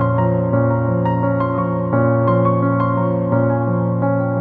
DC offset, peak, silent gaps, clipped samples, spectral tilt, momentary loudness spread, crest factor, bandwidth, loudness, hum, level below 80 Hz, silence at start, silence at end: under 0.1%; -4 dBFS; none; under 0.1%; -12.5 dB/octave; 3 LU; 14 dB; 3.4 kHz; -17 LUFS; none; -46 dBFS; 0 s; 0 s